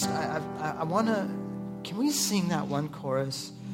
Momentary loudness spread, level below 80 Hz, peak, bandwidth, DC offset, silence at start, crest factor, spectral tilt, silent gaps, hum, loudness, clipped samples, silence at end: 10 LU; -64 dBFS; -12 dBFS; 16.5 kHz; under 0.1%; 0 s; 18 dB; -4.5 dB/octave; none; none; -30 LUFS; under 0.1%; 0 s